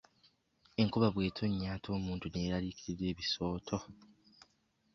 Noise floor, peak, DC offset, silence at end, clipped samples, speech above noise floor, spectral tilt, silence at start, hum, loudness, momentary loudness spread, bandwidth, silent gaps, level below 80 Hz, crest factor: -75 dBFS; -16 dBFS; under 0.1%; 1 s; under 0.1%; 39 dB; -5.5 dB/octave; 0.8 s; none; -36 LUFS; 10 LU; 7.4 kHz; none; -56 dBFS; 20 dB